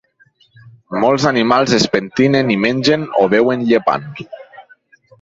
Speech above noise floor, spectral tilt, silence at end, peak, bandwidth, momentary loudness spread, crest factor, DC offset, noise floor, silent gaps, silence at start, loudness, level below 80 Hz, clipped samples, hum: 40 dB; -5 dB/octave; 0.6 s; 0 dBFS; 8 kHz; 14 LU; 16 dB; under 0.1%; -54 dBFS; none; 0.65 s; -14 LUFS; -52 dBFS; under 0.1%; none